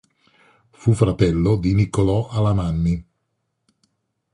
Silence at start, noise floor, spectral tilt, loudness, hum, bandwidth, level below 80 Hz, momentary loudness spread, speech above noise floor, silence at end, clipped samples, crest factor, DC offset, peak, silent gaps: 0.8 s; -74 dBFS; -8 dB/octave; -20 LUFS; none; 11 kHz; -36 dBFS; 5 LU; 56 dB; 1.3 s; under 0.1%; 18 dB; under 0.1%; -2 dBFS; none